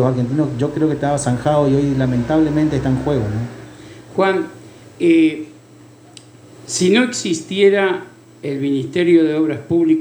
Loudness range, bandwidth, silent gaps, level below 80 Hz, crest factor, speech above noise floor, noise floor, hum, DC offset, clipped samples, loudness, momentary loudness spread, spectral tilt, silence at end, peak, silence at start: 3 LU; over 20 kHz; none; -44 dBFS; 16 dB; 28 dB; -43 dBFS; none; under 0.1%; under 0.1%; -17 LUFS; 13 LU; -6 dB/octave; 0 s; -2 dBFS; 0 s